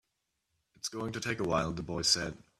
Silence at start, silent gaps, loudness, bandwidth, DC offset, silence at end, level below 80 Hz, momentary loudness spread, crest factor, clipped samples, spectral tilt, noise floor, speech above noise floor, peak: 0.85 s; none; -32 LUFS; 15 kHz; under 0.1%; 0.2 s; -56 dBFS; 11 LU; 24 dB; under 0.1%; -3 dB/octave; -83 dBFS; 49 dB; -12 dBFS